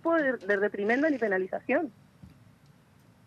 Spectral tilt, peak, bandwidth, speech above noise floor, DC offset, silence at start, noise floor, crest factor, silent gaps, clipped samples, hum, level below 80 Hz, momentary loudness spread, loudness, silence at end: -7 dB/octave; -14 dBFS; 9.4 kHz; 32 dB; under 0.1%; 0.05 s; -59 dBFS; 16 dB; none; under 0.1%; none; -72 dBFS; 4 LU; -28 LUFS; 1 s